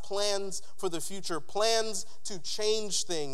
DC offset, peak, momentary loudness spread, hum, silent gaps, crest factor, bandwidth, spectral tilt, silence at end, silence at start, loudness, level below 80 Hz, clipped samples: 3%; -12 dBFS; 10 LU; none; none; 20 dB; 16 kHz; -2 dB/octave; 0 s; 0.05 s; -32 LUFS; -64 dBFS; under 0.1%